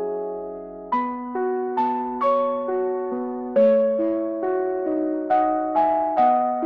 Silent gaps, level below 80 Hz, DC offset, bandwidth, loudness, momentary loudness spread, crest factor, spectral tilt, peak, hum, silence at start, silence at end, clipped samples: none; -62 dBFS; under 0.1%; 5 kHz; -22 LUFS; 9 LU; 14 dB; -8.5 dB/octave; -8 dBFS; none; 0 s; 0 s; under 0.1%